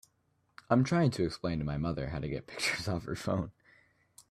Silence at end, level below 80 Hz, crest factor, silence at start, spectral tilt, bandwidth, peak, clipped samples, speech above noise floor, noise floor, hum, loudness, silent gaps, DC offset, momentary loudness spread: 0.8 s; -54 dBFS; 20 dB; 0.7 s; -6 dB/octave; 14.5 kHz; -14 dBFS; under 0.1%; 43 dB; -74 dBFS; none; -33 LUFS; none; under 0.1%; 8 LU